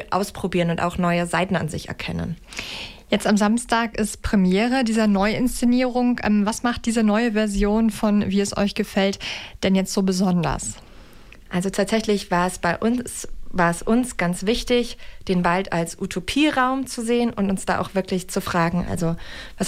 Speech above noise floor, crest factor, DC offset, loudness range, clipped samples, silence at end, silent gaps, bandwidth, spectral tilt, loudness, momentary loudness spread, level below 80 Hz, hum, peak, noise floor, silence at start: 22 dB; 14 dB; under 0.1%; 3 LU; under 0.1%; 0 s; none; 15.5 kHz; -5 dB/octave; -22 LUFS; 10 LU; -40 dBFS; none; -6 dBFS; -44 dBFS; 0 s